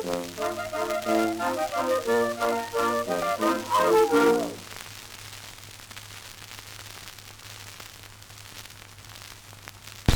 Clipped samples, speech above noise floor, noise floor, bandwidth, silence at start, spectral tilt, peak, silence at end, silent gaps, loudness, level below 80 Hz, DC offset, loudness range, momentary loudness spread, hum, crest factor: under 0.1%; 21 dB; -46 dBFS; over 20 kHz; 0 s; -4.5 dB/octave; -4 dBFS; 0 s; none; -25 LUFS; -46 dBFS; under 0.1%; 17 LU; 21 LU; none; 24 dB